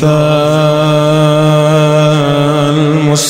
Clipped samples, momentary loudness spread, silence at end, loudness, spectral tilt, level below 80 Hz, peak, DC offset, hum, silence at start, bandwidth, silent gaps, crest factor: under 0.1%; 2 LU; 0 s; -9 LUFS; -6 dB/octave; -46 dBFS; 0 dBFS; 0.9%; none; 0 s; 15.5 kHz; none; 8 dB